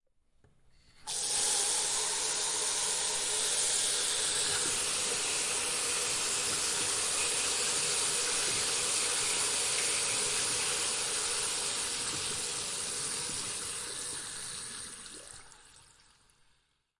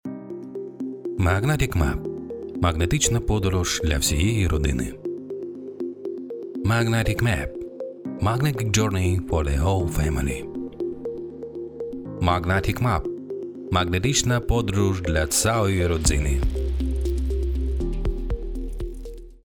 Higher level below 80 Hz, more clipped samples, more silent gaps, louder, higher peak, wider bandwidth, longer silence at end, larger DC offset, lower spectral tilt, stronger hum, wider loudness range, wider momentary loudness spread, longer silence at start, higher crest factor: second, -64 dBFS vs -30 dBFS; neither; neither; second, -29 LUFS vs -24 LUFS; second, -16 dBFS vs -2 dBFS; second, 11.5 kHz vs 18 kHz; first, 1.2 s vs 0.05 s; neither; second, 1 dB/octave vs -5 dB/octave; neither; first, 8 LU vs 4 LU; second, 9 LU vs 13 LU; first, 1 s vs 0.05 s; about the same, 16 dB vs 20 dB